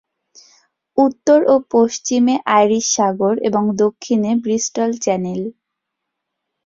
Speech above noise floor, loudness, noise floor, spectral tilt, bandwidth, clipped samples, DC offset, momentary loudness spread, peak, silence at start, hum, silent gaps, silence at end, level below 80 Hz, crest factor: 62 dB; -16 LUFS; -78 dBFS; -4.5 dB/octave; 7.6 kHz; under 0.1%; under 0.1%; 7 LU; -2 dBFS; 0.95 s; none; none; 1.15 s; -60 dBFS; 16 dB